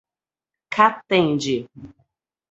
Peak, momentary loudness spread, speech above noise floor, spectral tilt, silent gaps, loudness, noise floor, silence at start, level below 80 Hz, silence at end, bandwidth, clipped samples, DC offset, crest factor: 0 dBFS; 11 LU; over 70 dB; -5 dB/octave; none; -20 LUFS; under -90 dBFS; 0.7 s; -60 dBFS; 0.65 s; 8.2 kHz; under 0.1%; under 0.1%; 22 dB